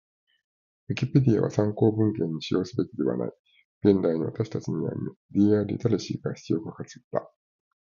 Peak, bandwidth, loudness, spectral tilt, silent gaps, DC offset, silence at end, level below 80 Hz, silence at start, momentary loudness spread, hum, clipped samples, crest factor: -6 dBFS; 7.4 kHz; -26 LUFS; -8 dB/octave; 3.39-3.44 s, 3.64-3.81 s, 5.16-5.29 s, 7.04-7.11 s; under 0.1%; 0.7 s; -58 dBFS; 0.9 s; 11 LU; none; under 0.1%; 20 dB